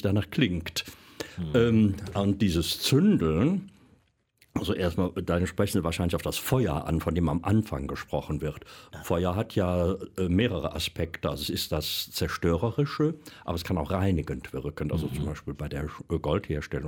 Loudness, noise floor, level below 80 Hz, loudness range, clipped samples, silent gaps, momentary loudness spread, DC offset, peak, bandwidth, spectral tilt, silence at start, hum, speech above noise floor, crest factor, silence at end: -28 LUFS; -65 dBFS; -44 dBFS; 4 LU; under 0.1%; none; 10 LU; under 0.1%; -10 dBFS; 17.5 kHz; -6 dB/octave; 0 s; none; 38 dB; 18 dB; 0 s